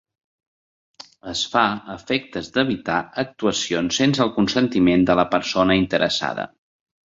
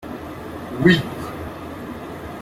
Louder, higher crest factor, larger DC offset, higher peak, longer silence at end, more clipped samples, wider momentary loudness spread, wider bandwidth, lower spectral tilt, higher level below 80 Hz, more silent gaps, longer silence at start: first, -20 LUFS vs -23 LUFS; about the same, 18 dB vs 22 dB; neither; about the same, -2 dBFS vs -2 dBFS; first, 0.65 s vs 0 s; neither; second, 10 LU vs 17 LU; second, 7.8 kHz vs 16 kHz; second, -4.5 dB/octave vs -6.5 dB/octave; about the same, -50 dBFS vs -46 dBFS; neither; first, 1.25 s vs 0 s